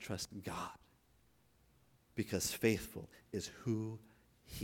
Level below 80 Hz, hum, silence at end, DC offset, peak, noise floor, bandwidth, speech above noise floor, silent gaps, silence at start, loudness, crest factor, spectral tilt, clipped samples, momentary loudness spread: -64 dBFS; none; 0 s; under 0.1%; -18 dBFS; -72 dBFS; 19 kHz; 32 dB; none; 0 s; -41 LUFS; 24 dB; -4.5 dB/octave; under 0.1%; 15 LU